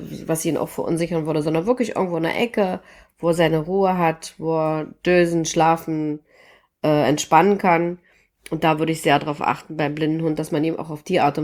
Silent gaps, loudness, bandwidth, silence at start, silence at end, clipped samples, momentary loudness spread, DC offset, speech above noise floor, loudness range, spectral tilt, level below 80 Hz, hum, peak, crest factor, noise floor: none; -21 LUFS; 17.5 kHz; 0 s; 0 s; under 0.1%; 8 LU; under 0.1%; 33 dB; 3 LU; -5.5 dB/octave; -56 dBFS; none; -2 dBFS; 20 dB; -53 dBFS